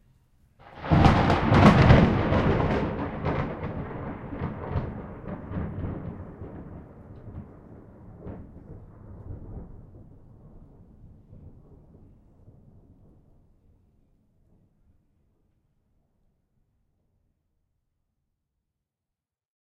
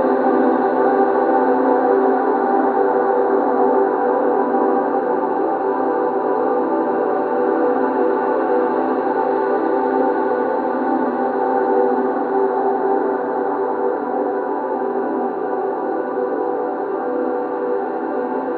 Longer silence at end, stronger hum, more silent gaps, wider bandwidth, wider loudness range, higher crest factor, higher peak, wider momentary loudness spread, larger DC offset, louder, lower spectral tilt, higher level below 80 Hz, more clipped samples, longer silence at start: first, 8.2 s vs 0 s; neither; neither; first, 9.6 kHz vs 4.5 kHz; first, 26 LU vs 5 LU; first, 26 dB vs 14 dB; about the same, -2 dBFS vs -2 dBFS; first, 28 LU vs 6 LU; neither; second, -24 LUFS vs -18 LUFS; second, -8 dB/octave vs -10 dB/octave; first, -38 dBFS vs -68 dBFS; neither; first, 0.7 s vs 0 s